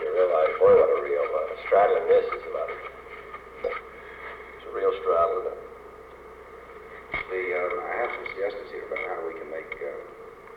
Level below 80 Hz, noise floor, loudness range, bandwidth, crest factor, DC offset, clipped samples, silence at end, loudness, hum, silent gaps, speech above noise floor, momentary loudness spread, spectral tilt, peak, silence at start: -56 dBFS; -45 dBFS; 8 LU; 5.2 kHz; 16 dB; under 0.1%; under 0.1%; 0 s; -25 LUFS; none; none; 20 dB; 23 LU; -6 dB/octave; -10 dBFS; 0 s